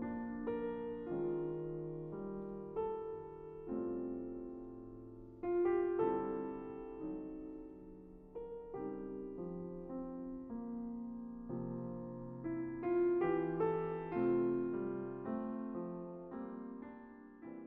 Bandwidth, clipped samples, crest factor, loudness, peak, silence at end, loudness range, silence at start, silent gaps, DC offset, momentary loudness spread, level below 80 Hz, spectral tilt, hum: 3.5 kHz; under 0.1%; 18 dB; -41 LUFS; -24 dBFS; 0 s; 9 LU; 0 s; none; under 0.1%; 15 LU; -64 dBFS; -8.5 dB/octave; none